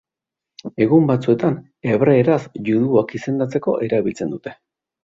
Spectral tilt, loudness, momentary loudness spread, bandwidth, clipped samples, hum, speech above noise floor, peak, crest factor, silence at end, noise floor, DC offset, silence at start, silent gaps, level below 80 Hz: -8.5 dB/octave; -18 LUFS; 12 LU; 7.6 kHz; under 0.1%; none; 68 dB; -2 dBFS; 16 dB; 0.5 s; -86 dBFS; under 0.1%; 0.65 s; none; -58 dBFS